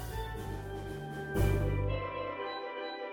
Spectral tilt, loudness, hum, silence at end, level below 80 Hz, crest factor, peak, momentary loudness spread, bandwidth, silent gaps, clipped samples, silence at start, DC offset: -6.5 dB/octave; -36 LUFS; none; 0 s; -42 dBFS; 16 dB; -18 dBFS; 10 LU; 18.5 kHz; none; under 0.1%; 0 s; under 0.1%